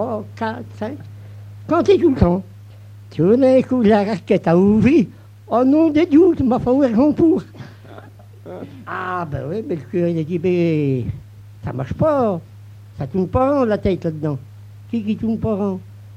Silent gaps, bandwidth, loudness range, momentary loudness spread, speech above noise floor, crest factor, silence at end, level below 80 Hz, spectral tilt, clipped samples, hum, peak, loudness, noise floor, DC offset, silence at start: none; 8.8 kHz; 7 LU; 18 LU; 23 dB; 16 dB; 0 s; -40 dBFS; -9 dB/octave; under 0.1%; none; -2 dBFS; -17 LUFS; -40 dBFS; under 0.1%; 0 s